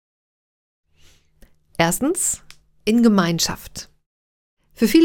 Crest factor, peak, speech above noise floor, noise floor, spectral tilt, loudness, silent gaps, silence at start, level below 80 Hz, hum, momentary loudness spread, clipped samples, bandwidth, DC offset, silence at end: 20 dB; -2 dBFS; 34 dB; -53 dBFS; -4 dB/octave; -19 LUFS; 4.06-4.57 s; 1.8 s; -48 dBFS; none; 18 LU; under 0.1%; 18 kHz; under 0.1%; 0 s